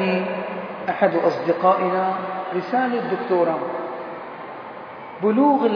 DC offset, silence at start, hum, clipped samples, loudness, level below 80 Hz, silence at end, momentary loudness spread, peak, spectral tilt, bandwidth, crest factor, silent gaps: under 0.1%; 0 s; none; under 0.1%; -22 LUFS; -72 dBFS; 0 s; 16 LU; -2 dBFS; -8 dB/octave; 5.4 kHz; 18 dB; none